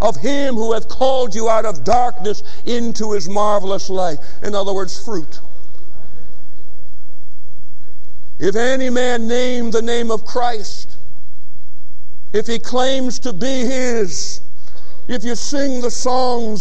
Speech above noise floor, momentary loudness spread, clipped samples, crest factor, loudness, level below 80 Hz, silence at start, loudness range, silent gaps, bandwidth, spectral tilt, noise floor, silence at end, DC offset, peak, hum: 21 dB; 10 LU; under 0.1%; 16 dB; -19 LUFS; -44 dBFS; 0 s; 8 LU; none; 10 kHz; -4.5 dB/octave; -40 dBFS; 0 s; 40%; -2 dBFS; 60 Hz at -50 dBFS